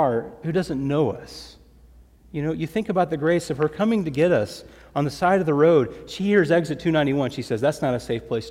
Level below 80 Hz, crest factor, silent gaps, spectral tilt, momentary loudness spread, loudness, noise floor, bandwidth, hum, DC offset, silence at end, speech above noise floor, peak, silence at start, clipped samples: -52 dBFS; 18 dB; none; -7 dB/octave; 11 LU; -22 LUFS; -50 dBFS; 15 kHz; none; under 0.1%; 0 s; 28 dB; -6 dBFS; 0 s; under 0.1%